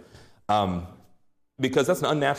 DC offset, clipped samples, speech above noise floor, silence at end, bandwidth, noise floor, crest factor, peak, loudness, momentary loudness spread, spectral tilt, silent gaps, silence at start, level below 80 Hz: under 0.1%; under 0.1%; 36 dB; 0 s; 15.5 kHz; -60 dBFS; 16 dB; -10 dBFS; -25 LUFS; 16 LU; -5 dB/octave; none; 0.5 s; -60 dBFS